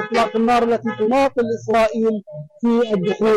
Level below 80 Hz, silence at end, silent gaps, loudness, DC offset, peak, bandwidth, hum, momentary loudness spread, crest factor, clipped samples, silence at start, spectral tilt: -50 dBFS; 0 s; none; -18 LUFS; under 0.1%; -10 dBFS; 12 kHz; none; 6 LU; 8 dB; under 0.1%; 0 s; -6 dB/octave